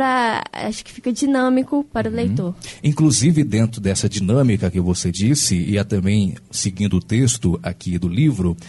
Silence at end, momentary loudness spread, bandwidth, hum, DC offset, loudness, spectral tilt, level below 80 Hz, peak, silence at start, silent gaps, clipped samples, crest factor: 0 s; 8 LU; 11.5 kHz; none; under 0.1%; -19 LUFS; -5 dB/octave; -42 dBFS; -6 dBFS; 0 s; none; under 0.1%; 14 dB